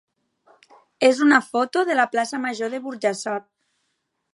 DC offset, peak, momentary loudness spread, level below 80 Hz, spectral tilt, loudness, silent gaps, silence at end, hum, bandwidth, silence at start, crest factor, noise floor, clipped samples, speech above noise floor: under 0.1%; -2 dBFS; 11 LU; -80 dBFS; -3.5 dB/octave; -21 LUFS; none; 0.95 s; none; 11.5 kHz; 1 s; 20 dB; -74 dBFS; under 0.1%; 54 dB